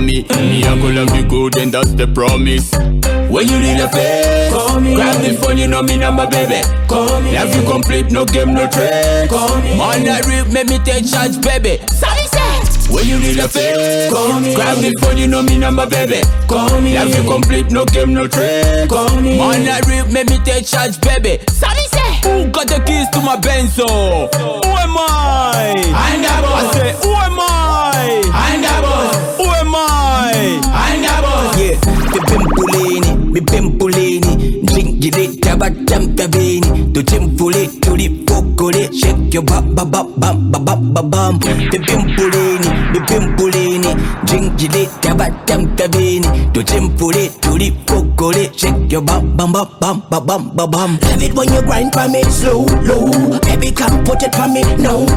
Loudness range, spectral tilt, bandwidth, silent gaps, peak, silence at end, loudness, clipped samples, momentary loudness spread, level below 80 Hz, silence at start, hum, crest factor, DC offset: 1 LU; -4.5 dB/octave; 17 kHz; none; 0 dBFS; 0 s; -13 LUFS; under 0.1%; 2 LU; -16 dBFS; 0 s; none; 12 dB; under 0.1%